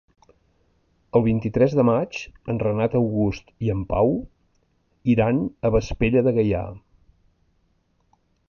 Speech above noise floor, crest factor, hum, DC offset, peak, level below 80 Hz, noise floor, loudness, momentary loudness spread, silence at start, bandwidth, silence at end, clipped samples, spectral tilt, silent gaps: 45 dB; 18 dB; none; under 0.1%; -6 dBFS; -40 dBFS; -66 dBFS; -22 LUFS; 9 LU; 1.15 s; 7 kHz; 1.7 s; under 0.1%; -8.5 dB/octave; none